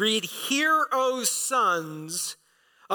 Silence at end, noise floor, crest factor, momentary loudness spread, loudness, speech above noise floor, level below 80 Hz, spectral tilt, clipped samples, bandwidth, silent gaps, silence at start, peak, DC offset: 0 s; -60 dBFS; 16 dB; 9 LU; -25 LUFS; 35 dB; -86 dBFS; -1.5 dB/octave; under 0.1%; 19 kHz; none; 0 s; -10 dBFS; under 0.1%